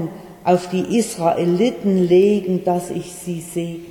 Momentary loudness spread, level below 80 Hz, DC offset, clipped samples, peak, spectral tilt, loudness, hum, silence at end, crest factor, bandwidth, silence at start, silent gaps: 14 LU; -54 dBFS; under 0.1%; under 0.1%; -4 dBFS; -6.5 dB/octave; -19 LUFS; none; 0 s; 14 dB; 17.5 kHz; 0 s; none